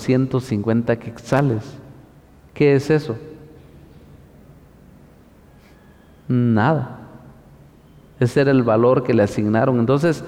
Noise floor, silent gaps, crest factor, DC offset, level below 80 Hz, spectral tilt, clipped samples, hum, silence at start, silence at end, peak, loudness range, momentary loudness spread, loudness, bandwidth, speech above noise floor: -48 dBFS; none; 14 dB; under 0.1%; -52 dBFS; -8 dB/octave; under 0.1%; none; 0 s; 0 s; -6 dBFS; 7 LU; 13 LU; -18 LUFS; 13 kHz; 31 dB